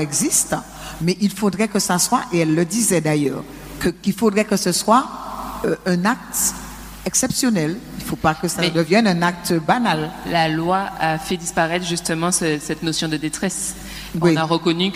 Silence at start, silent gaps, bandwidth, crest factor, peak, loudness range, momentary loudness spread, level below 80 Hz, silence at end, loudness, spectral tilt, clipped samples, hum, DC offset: 0 s; none; 16 kHz; 18 dB; -2 dBFS; 2 LU; 9 LU; -44 dBFS; 0 s; -19 LUFS; -4 dB/octave; under 0.1%; none; under 0.1%